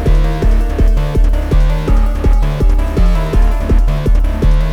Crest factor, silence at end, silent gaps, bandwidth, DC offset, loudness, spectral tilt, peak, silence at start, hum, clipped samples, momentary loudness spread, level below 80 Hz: 10 dB; 0 s; none; 6.6 kHz; under 0.1%; -15 LUFS; -7.5 dB/octave; 0 dBFS; 0 s; none; under 0.1%; 1 LU; -10 dBFS